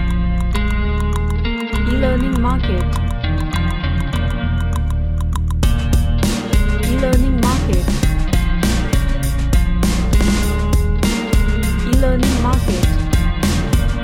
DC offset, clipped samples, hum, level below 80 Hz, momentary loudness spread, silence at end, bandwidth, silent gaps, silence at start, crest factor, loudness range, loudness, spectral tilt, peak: 0.2%; under 0.1%; none; -18 dBFS; 4 LU; 0 s; 16.5 kHz; none; 0 s; 14 dB; 2 LU; -18 LUFS; -6 dB/octave; -2 dBFS